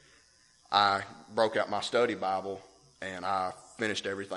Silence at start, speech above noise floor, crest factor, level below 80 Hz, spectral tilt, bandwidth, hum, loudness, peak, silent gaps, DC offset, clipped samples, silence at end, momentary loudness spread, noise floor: 0.7 s; 32 dB; 24 dB; -72 dBFS; -3.5 dB/octave; 11.5 kHz; none; -31 LUFS; -8 dBFS; none; under 0.1%; under 0.1%; 0 s; 13 LU; -63 dBFS